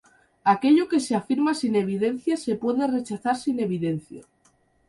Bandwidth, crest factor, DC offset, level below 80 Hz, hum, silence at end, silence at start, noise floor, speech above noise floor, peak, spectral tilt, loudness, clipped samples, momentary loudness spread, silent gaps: 11.5 kHz; 16 dB; under 0.1%; -66 dBFS; none; 0.7 s; 0.45 s; -64 dBFS; 40 dB; -8 dBFS; -6 dB/octave; -24 LUFS; under 0.1%; 8 LU; none